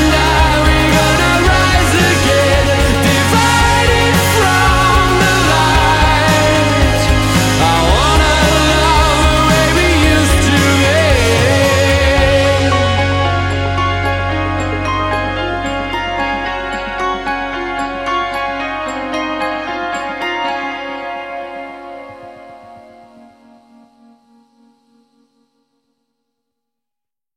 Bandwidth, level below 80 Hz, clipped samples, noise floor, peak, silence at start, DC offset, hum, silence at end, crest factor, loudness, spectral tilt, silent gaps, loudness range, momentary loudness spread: 16.5 kHz; -22 dBFS; under 0.1%; -88 dBFS; 0 dBFS; 0 s; under 0.1%; none; 4.55 s; 14 dB; -12 LUFS; -4.5 dB/octave; none; 11 LU; 9 LU